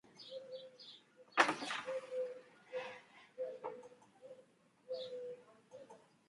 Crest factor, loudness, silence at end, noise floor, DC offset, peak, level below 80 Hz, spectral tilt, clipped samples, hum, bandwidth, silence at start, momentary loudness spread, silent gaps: 30 dB; -42 LUFS; 0.25 s; -68 dBFS; under 0.1%; -14 dBFS; under -90 dBFS; -2.5 dB/octave; under 0.1%; none; 11.5 kHz; 0.05 s; 26 LU; none